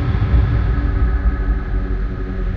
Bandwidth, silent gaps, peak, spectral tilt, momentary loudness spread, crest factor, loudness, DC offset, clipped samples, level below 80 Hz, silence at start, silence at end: 4.8 kHz; none; -4 dBFS; -9.5 dB/octave; 8 LU; 12 dB; -20 LUFS; under 0.1%; under 0.1%; -18 dBFS; 0 s; 0 s